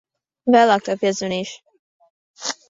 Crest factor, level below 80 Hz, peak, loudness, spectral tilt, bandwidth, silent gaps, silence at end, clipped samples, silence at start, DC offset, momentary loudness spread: 18 dB; -66 dBFS; -2 dBFS; -19 LUFS; -4 dB/octave; 7.8 kHz; 1.79-2.00 s, 2.10-2.34 s; 0.15 s; under 0.1%; 0.45 s; under 0.1%; 14 LU